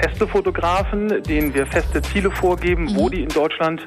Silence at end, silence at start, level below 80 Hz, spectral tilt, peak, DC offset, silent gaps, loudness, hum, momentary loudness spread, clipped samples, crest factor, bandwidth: 0 s; 0 s; -28 dBFS; -6 dB/octave; -6 dBFS; under 0.1%; none; -20 LUFS; none; 2 LU; under 0.1%; 12 dB; 14 kHz